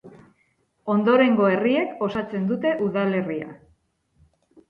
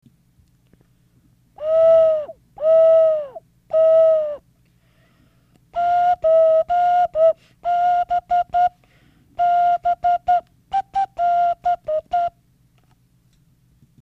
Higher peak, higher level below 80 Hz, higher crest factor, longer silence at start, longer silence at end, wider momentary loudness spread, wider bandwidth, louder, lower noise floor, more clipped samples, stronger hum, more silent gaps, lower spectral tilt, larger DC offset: about the same, -6 dBFS vs -8 dBFS; second, -62 dBFS vs -56 dBFS; first, 18 dB vs 12 dB; second, 0.05 s vs 1.6 s; second, 1.15 s vs 1.75 s; about the same, 13 LU vs 12 LU; about the same, 5.6 kHz vs 5.8 kHz; second, -22 LUFS vs -18 LUFS; first, -67 dBFS vs -58 dBFS; neither; neither; neither; first, -9 dB/octave vs -5 dB/octave; neither